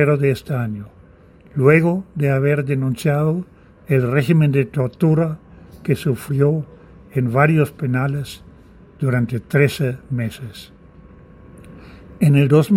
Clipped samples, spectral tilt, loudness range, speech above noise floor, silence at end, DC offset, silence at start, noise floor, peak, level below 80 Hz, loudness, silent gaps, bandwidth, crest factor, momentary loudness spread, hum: under 0.1%; -8 dB/octave; 5 LU; 30 dB; 0 s; under 0.1%; 0 s; -47 dBFS; 0 dBFS; -50 dBFS; -18 LUFS; none; 16 kHz; 18 dB; 14 LU; none